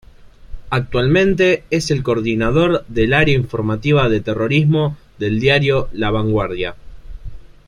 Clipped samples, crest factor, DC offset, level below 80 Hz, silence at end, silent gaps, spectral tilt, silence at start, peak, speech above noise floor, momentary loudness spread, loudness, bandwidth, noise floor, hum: under 0.1%; 16 dB; under 0.1%; -34 dBFS; 0.2 s; none; -6.5 dB/octave; 0.2 s; -2 dBFS; 24 dB; 8 LU; -16 LUFS; 11 kHz; -40 dBFS; none